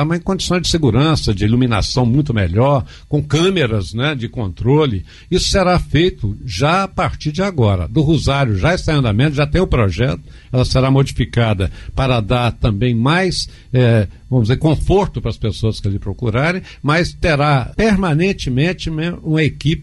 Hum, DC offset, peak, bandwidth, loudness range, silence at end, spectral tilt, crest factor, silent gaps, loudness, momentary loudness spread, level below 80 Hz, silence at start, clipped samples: none; under 0.1%; -4 dBFS; 11.5 kHz; 1 LU; 0 s; -6 dB/octave; 12 dB; none; -16 LUFS; 7 LU; -28 dBFS; 0 s; under 0.1%